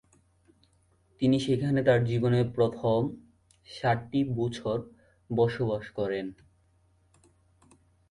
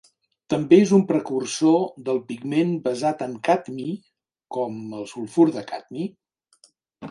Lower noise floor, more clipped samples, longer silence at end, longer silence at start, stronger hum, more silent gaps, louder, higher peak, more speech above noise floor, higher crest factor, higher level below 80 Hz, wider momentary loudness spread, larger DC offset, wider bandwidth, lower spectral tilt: first, -66 dBFS vs -59 dBFS; neither; first, 1.75 s vs 0 s; first, 1.2 s vs 0.5 s; neither; neither; second, -28 LUFS vs -22 LUFS; second, -12 dBFS vs -4 dBFS; about the same, 39 dB vs 38 dB; about the same, 18 dB vs 20 dB; first, -58 dBFS vs -68 dBFS; second, 10 LU vs 16 LU; neither; about the same, 11 kHz vs 11.5 kHz; about the same, -7.5 dB/octave vs -6.5 dB/octave